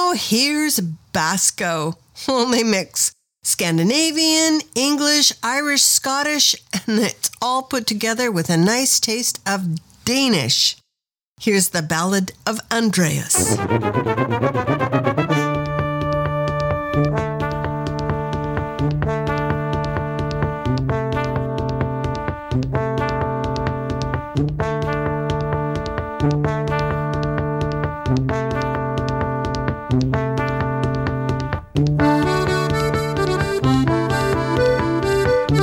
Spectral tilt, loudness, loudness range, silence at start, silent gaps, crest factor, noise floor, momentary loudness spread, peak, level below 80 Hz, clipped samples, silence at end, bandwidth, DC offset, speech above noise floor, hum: -4 dB/octave; -19 LUFS; 6 LU; 0 s; 11.28-11.36 s; 18 dB; -83 dBFS; 8 LU; 0 dBFS; -36 dBFS; under 0.1%; 0 s; 19 kHz; under 0.1%; 64 dB; none